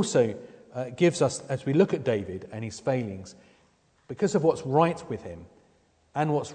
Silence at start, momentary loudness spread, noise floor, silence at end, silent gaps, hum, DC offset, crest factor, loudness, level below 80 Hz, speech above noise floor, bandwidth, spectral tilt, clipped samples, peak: 0 s; 18 LU; -65 dBFS; 0 s; none; none; under 0.1%; 20 dB; -27 LUFS; -64 dBFS; 38 dB; 9.4 kHz; -6 dB/octave; under 0.1%; -8 dBFS